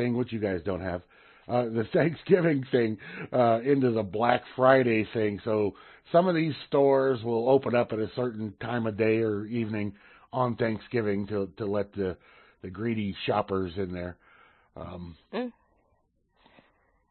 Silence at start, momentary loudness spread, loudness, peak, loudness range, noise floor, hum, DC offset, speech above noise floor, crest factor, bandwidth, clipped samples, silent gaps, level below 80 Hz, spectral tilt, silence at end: 0 s; 14 LU; -27 LUFS; -6 dBFS; 9 LU; -71 dBFS; none; under 0.1%; 44 dB; 22 dB; 4.4 kHz; under 0.1%; none; -62 dBFS; -11 dB/octave; 1.6 s